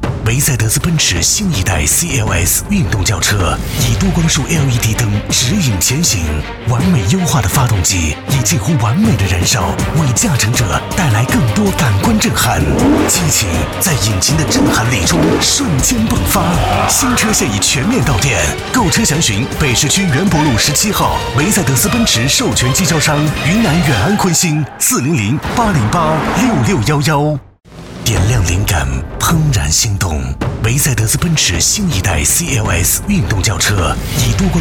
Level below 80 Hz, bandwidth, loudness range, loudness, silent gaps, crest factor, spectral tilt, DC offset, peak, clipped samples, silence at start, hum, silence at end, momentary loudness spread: -26 dBFS; 19 kHz; 2 LU; -12 LUFS; none; 10 dB; -4 dB/octave; under 0.1%; -2 dBFS; under 0.1%; 0 s; none; 0 s; 4 LU